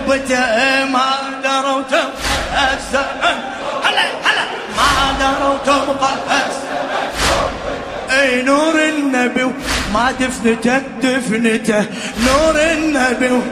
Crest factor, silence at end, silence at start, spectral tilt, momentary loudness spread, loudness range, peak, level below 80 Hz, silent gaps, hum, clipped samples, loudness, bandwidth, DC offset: 16 dB; 0 s; 0 s; -3 dB/octave; 6 LU; 1 LU; 0 dBFS; -34 dBFS; none; none; under 0.1%; -15 LUFS; 15.5 kHz; under 0.1%